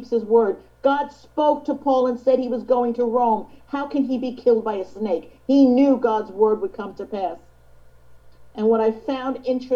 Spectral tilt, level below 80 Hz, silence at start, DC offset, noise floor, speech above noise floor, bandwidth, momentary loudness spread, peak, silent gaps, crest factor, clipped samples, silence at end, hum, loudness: -7.5 dB/octave; -56 dBFS; 0 s; 0.1%; -48 dBFS; 27 dB; 7 kHz; 11 LU; -4 dBFS; none; 16 dB; under 0.1%; 0 s; none; -21 LUFS